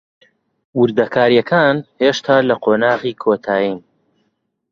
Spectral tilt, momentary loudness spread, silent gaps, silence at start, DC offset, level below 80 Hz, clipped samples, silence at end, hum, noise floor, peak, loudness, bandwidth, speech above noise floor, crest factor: -6 dB/octave; 6 LU; none; 0.75 s; under 0.1%; -58 dBFS; under 0.1%; 0.9 s; none; -68 dBFS; 0 dBFS; -15 LUFS; 7.4 kHz; 53 dB; 16 dB